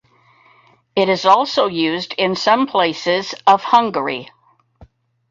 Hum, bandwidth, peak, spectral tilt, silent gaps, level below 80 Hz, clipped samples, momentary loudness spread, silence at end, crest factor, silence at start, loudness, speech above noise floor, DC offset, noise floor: none; 7.6 kHz; 0 dBFS; -4.5 dB/octave; none; -60 dBFS; under 0.1%; 8 LU; 0.45 s; 18 dB; 0.95 s; -16 LUFS; 37 dB; under 0.1%; -53 dBFS